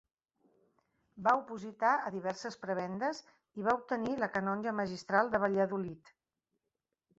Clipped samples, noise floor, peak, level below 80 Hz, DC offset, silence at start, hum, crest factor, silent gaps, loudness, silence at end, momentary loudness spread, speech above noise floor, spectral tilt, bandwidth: under 0.1%; -88 dBFS; -14 dBFS; -72 dBFS; under 0.1%; 1.15 s; none; 22 dB; none; -34 LUFS; 1.2 s; 10 LU; 54 dB; -4.5 dB/octave; 8 kHz